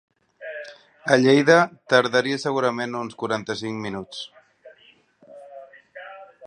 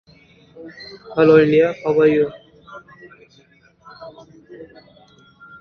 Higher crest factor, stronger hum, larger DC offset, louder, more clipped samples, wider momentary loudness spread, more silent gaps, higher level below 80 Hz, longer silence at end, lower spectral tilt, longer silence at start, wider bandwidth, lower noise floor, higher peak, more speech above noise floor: about the same, 22 dB vs 18 dB; neither; neither; second, -21 LUFS vs -15 LUFS; neither; second, 25 LU vs 28 LU; neither; second, -68 dBFS vs -58 dBFS; second, 0 s vs 0.95 s; second, -5 dB/octave vs -8 dB/octave; second, 0.4 s vs 0.6 s; first, 10 kHz vs 6.4 kHz; about the same, -56 dBFS vs -54 dBFS; about the same, -2 dBFS vs -2 dBFS; about the same, 36 dB vs 38 dB